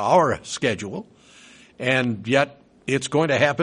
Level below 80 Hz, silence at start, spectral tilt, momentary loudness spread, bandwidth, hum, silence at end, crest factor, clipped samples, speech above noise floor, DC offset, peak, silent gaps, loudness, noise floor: -60 dBFS; 0 s; -5 dB/octave; 12 LU; 10.5 kHz; none; 0 s; 20 dB; under 0.1%; 28 dB; under 0.1%; -4 dBFS; none; -22 LUFS; -49 dBFS